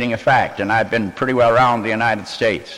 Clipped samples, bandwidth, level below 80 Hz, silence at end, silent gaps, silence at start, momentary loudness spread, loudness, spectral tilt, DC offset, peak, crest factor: under 0.1%; 12.5 kHz; -46 dBFS; 0 s; none; 0 s; 6 LU; -17 LUFS; -5.5 dB/octave; under 0.1%; -4 dBFS; 12 dB